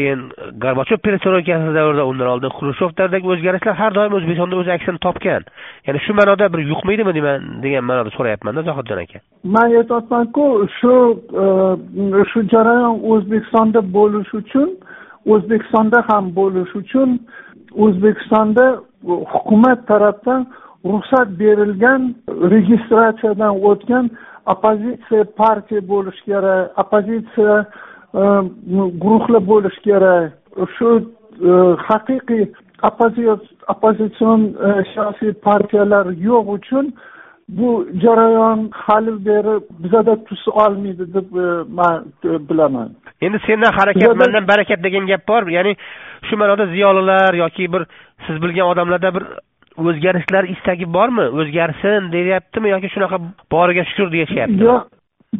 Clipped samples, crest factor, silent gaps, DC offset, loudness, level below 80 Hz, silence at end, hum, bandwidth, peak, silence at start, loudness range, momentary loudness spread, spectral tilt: under 0.1%; 14 dB; none; under 0.1%; -15 LUFS; -52 dBFS; 0 s; none; 4 kHz; 0 dBFS; 0 s; 3 LU; 10 LU; -5 dB/octave